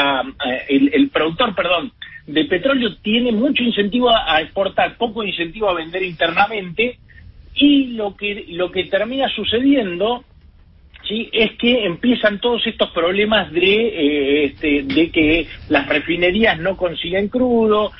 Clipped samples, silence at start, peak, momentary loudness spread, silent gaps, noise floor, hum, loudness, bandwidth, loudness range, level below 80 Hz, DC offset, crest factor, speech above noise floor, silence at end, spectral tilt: under 0.1%; 0 s; -2 dBFS; 7 LU; none; -46 dBFS; none; -17 LUFS; 5.8 kHz; 3 LU; -42 dBFS; under 0.1%; 16 dB; 29 dB; 0.05 s; -10 dB/octave